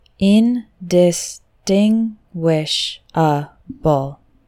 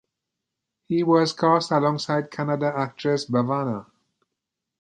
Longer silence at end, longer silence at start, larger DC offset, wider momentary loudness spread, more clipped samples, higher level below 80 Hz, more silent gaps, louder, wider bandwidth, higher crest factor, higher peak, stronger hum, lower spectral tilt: second, 0.35 s vs 1 s; second, 0.2 s vs 0.9 s; neither; about the same, 10 LU vs 8 LU; neither; first, -48 dBFS vs -70 dBFS; neither; first, -17 LUFS vs -23 LUFS; first, 15 kHz vs 9.8 kHz; about the same, 16 dB vs 20 dB; first, -2 dBFS vs -6 dBFS; neither; about the same, -5.5 dB/octave vs -6 dB/octave